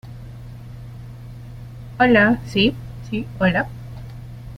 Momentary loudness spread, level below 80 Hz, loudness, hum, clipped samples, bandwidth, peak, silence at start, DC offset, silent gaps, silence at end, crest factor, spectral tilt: 22 LU; -42 dBFS; -19 LUFS; none; under 0.1%; 15 kHz; -2 dBFS; 0.05 s; under 0.1%; none; 0 s; 20 dB; -7 dB/octave